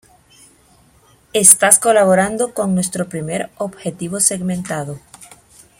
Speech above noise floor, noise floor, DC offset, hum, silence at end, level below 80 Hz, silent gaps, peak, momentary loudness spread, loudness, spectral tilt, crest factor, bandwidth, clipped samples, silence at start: 36 dB; -52 dBFS; under 0.1%; none; 0.55 s; -56 dBFS; none; 0 dBFS; 17 LU; -14 LUFS; -3 dB/octave; 18 dB; 16.5 kHz; 0.2%; 1.35 s